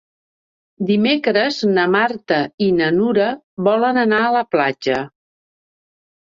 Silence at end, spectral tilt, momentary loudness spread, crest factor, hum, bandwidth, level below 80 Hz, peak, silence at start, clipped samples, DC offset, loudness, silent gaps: 1.2 s; -6 dB/octave; 6 LU; 16 dB; none; 7.6 kHz; -60 dBFS; -2 dBFS; 0.8 s; under 0.1%; under 0.1%; -17 LUFS; 2.54-2.58 s, 3.43-3.57 s